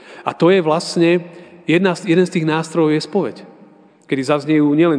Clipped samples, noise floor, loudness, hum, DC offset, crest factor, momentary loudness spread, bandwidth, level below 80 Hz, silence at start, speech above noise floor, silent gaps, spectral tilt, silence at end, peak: under 0.1%; -46 dBFS; -16 LUFS; none; under 0.1%; 16 dB; 10 LU; 10 kHz; -70 dBFS; 0.1 s; 31 dB; none; -6.5 dB/octave; 0 s; -2 dBFS